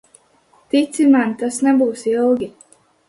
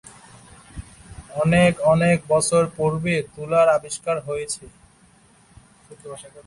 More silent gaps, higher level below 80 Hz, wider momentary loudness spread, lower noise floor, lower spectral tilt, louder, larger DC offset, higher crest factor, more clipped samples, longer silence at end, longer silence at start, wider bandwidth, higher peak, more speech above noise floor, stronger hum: neither; second, -62 dBFS vs -48 dBFS; second, 7 LU vs 23 LU; about the same, -55 dBFS vs -54 dBFS; about the same, -4.5 dB/octave vs -5.5 dB/octave; first, -17 LUFS vs -20 LUFS; neither; about the same, 14 dB vs 18 dB; neither; first, 0.6 s vs 0.05 s; first, 0.75 s vs 0.05 s; about the same, 11.5 kHz vs 11.5 kHz; about the same, -4 dBFS vs -4 dBFS; first, 39 dB vs 34 dB; neither